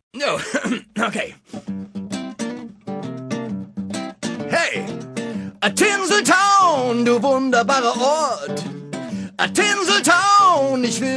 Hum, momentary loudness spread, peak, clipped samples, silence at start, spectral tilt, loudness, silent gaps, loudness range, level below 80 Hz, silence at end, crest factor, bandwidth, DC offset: none; 16 LU; -2 dBFS; under 0.1%; 0.15 s; -3 dB/octave; -18 LUFS; none; 11 LU; -64 dBFS; 0 s; 18 dB; 11 kHz; under 0.1%